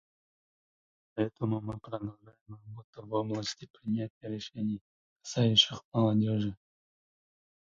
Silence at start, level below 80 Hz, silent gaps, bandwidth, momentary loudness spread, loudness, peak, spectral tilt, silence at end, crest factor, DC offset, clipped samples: 1.15 s; -64 dBFS; 2.41-2.46 s, 2.84-2.93 s, 3.70-3.74 s, 4.10-4.21 s, 4.81-5.16 s, 5.85-5.92 s; 7.8 kHz; 22 LU; -31 LUFS; -10 dBFS; -5.5 dB/octave; 1.2 s; 24 dB; under 0.1%; under 0.1%